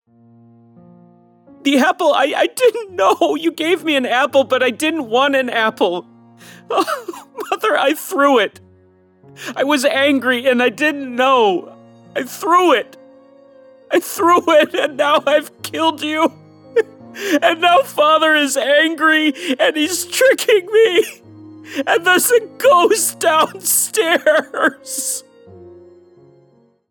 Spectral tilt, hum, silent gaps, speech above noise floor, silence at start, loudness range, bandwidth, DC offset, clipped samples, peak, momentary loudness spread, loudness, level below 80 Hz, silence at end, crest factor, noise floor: -1.5 dB/octave; none; none; 38 dB; 1.65 s; 4 LU; over 20 kHz; under 0.1%; under 0.1%; -2 dBFS; 10 LU; -15 LUFS; -76 dBFS; 1.2 s; 14 dB; -54 dBFS